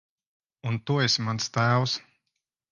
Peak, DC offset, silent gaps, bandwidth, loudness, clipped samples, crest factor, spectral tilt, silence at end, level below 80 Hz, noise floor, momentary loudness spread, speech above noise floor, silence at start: -10 dBFS; under 0.1%; none; 9.6 kHz; -26 LUFS; under 0.1%; 18 dB; -4.5 dB/octave; 0.7 s; -64 dBFS; -82 dBFS; 9 LU; 57 dB; 0.65 s